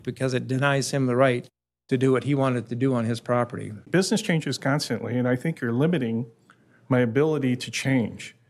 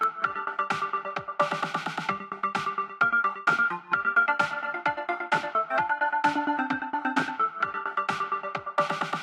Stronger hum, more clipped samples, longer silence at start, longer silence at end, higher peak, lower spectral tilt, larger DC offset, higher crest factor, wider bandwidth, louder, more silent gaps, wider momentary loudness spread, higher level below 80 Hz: neither; neither; about the same, 0.05 s vs 0 s; first, 0.2 s vs 0 s; about the same, -8 dBFS vs -8 dBFS; first, -6 dB/octave vs -4.5 dB/octave; neither; about the same, 16 dB vs 20 dB; about the same, 13.5 kHz vs 12.5 kHz; first, -24 LUFS vs -27 LUFS; neither; about the same, 6 LU vs 7 LU; first, -66 dBFS vs -72 dBFS